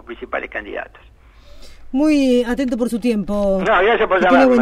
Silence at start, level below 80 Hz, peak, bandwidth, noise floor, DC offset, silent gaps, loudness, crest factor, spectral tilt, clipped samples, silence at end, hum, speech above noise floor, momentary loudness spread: 0.1 s; -38 dBFS; -2 dBFS; 14 kHz; -41 dBFS; under 0.1%; none; -17 LUFS; 14 dB; -5.5 dB/octave; under 0.1%; 0 s; none; 25 dB; 14 LU